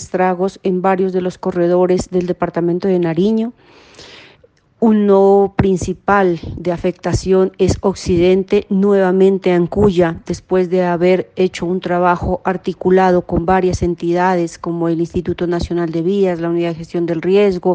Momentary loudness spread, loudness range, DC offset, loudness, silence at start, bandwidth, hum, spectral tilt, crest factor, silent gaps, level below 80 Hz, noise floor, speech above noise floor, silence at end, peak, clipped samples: 7 LU; 3 LU; under 0.1%; -15 LUFS; 0 s; 9.2 kHz; none; -7 dB/octave; 14 dB; none; -38 dBFS; -51 dBFS; 37 dB; 0 s; 0 dBFS; under 0.1%